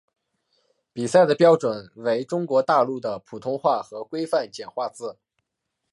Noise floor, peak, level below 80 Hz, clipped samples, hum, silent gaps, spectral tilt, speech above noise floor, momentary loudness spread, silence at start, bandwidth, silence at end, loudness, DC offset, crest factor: -80 dBFS; -4 dBFS; -72 dBFS; under 0.1%; none; none; -5.5 dB/octave; 58 dB; 15 LU; 0.95 s; 11.5 kHz; 0.8 s; -23 LUFS; under 0.1%; 20 dB